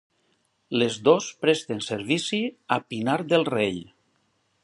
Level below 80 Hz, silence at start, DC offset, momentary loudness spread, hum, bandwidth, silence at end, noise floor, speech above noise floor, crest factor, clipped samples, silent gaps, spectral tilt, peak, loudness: -66 dBFS; 0.7 s; under 0.1%; 8 LU; none; 11.5 kHz; 0.8 s; -70 dBFS; 45 dB; 22 dB; under 0.1%; none; -4.5 dB/octave; -4 dBFS; -24 LUFS